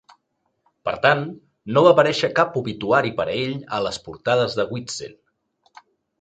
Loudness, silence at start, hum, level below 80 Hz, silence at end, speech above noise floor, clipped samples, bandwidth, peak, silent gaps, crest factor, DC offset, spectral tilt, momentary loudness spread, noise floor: -21 LUFS; 0.85 s; none; -58 dBFS; 1.1 s; 52 dB; under 0.1%; 9.2 kHz; 0 dBFS; none; 22 dB; under 0.1%; -5 dB/octave; 16 LU; -73 dBFS